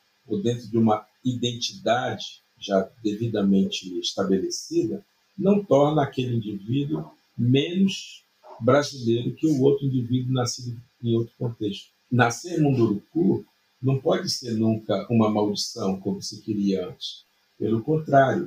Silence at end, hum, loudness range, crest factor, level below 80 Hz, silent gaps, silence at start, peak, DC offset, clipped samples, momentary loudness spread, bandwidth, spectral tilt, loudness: 0 s; none; 2 LU; 20 dB; -62 dBFS; none; 0.3 s; -4 dBFS; under 0.1%; under 0.1%; 10 LU; 15.5 kHz; -6 dB/octave; -24 LUFS